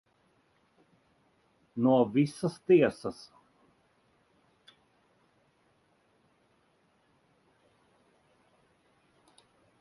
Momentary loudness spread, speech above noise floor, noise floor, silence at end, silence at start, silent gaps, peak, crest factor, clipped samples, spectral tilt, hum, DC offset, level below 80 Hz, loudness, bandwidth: 21 LU; 43 dB; -70 dBFS; 6.7 s; 1.75 s; none; -12 dBFS; 22 dB; under 0.1%; -7.5 dB/octave; none; under 0.1%; -74 dBFS; -28 LUFS; 11.5 kHz